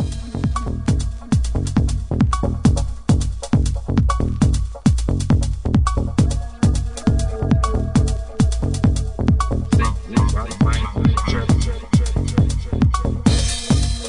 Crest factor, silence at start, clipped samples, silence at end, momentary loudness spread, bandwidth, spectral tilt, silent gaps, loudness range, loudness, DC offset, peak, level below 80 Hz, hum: 16 dB; 0 s; under 0.1%; 0 s; 3 LU; 11 kHz; -6.5 dB/octave; none; 1 LU; -20 LUFS; under 0.1%; -2 dBFS; -22 dBFS; none